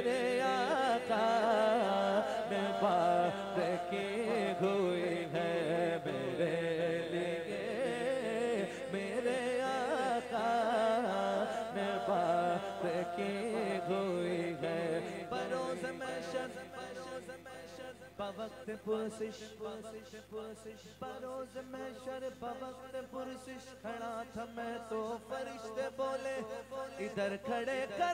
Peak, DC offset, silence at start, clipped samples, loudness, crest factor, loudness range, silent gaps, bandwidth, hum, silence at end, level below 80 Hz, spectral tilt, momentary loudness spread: -18 dBFS; under 0.1%; 0 s; under 0.1%; -36 LUFS; 18 dB; 12 LU; none; 16 kHz; 50 Hz at -65 dBFS; 0 s; -72 dBFS; -5 dB/octave; 14 LU